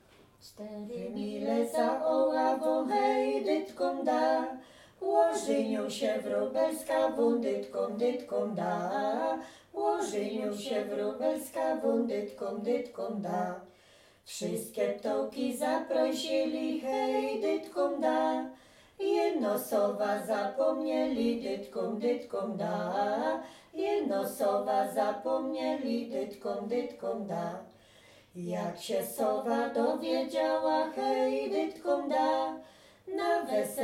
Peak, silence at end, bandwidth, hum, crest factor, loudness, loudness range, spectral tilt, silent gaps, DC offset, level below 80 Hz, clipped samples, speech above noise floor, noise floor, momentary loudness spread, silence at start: -14 dBFS; 0 s; 16.5 kHz; none; 18 dB; -32 LUFS; 5 LU; -5 dB/octave; none; under 0.1%; -72 dBFS; under 0.1%; 30 dB; -61 dBFS; 9 LU; 0.45 s